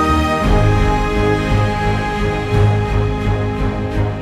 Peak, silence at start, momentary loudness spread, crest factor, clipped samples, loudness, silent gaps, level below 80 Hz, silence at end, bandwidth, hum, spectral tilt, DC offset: -2 dBFS; 0 s; 5 LU; 14 dB; under 0.1%; -16 LUFS; none; -22 dBFS; 0 s; 12 kHz; none; -7 dB/octave; under 0.1%